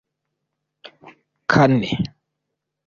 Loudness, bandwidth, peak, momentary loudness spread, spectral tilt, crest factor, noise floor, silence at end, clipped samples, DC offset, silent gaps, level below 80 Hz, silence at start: -19 LUFS; 7.4 kHz; -2 dBFS; 14 LU; -7 dB/octave; 20 dB; -80 dBFS; 0.8 s; under 0.1%; under 0.1%; none; -52 dBFS; 1.05 s